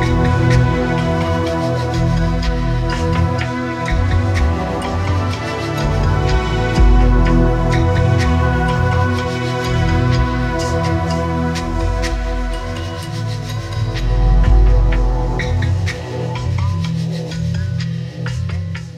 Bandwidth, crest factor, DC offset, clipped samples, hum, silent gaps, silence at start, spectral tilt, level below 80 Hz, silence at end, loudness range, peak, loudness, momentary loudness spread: 10 kHz; 14 dB; under 0.1%; under 0.1%; none; none; 0 s; -6.5 dB/octave; -20 dBFS; 0 s; 5 LU; 0 dBFS; -17 LUFS; 9 LU